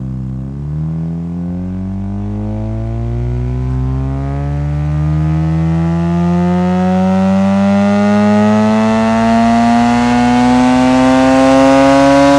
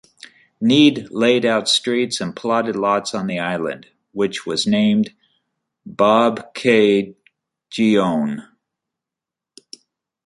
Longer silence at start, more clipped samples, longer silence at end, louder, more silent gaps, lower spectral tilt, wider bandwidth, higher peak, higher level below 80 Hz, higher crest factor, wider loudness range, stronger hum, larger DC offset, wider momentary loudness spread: second, 0 s vs 0.6 s; neither; second, 0 s vs 1.85 s; first, -12 LUFS vs -18 LUFS; neither; first, -7 dB/octave vs -4.5 dB/octave; about the same, 12 kHz vs 11.5 kHz; about the same, 0 dBFS vs -2 dBFS; first, -28 dBFS vs -62 dBFS; about the same, 12 dB vs 16 dB; first, 9 LU vs 4 LU; neither; neither; about the same, 12 LU vs 12 LU